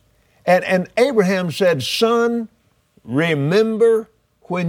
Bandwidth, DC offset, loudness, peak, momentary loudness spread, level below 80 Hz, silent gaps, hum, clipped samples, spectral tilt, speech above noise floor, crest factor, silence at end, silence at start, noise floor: 17 kHz; under 0.1%; -18 LUFS; -4 dBFS; 9 LU; -62 dBFS; none; none; under 0.1%; -5.5 dB/octave; 42 dB; 16 dB; 0 s; 0.45 s; -58 dBFS